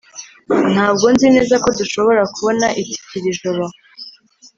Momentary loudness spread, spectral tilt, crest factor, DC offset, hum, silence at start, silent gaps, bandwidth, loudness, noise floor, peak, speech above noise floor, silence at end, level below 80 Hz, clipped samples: 23 LU; -4.5 dB/octave; 16 dB; under 0.1%; none; 0.15 s; none; 7.8 kHz; -15 LUFS; -44 dBFS; 0 dBFS; 30 dB; 0.5 s; -50 dBFS; under 0.1%